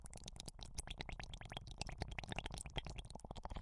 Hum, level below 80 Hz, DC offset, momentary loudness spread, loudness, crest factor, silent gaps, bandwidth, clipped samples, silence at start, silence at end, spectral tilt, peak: none; -54 dBFS; under 0.1%; 6 LU; -50 LUFS; 26 dB; none; 11.5 kHz; under 0.1%; 0 s; 0 s; -3.5 dB/octave; -22 dBFS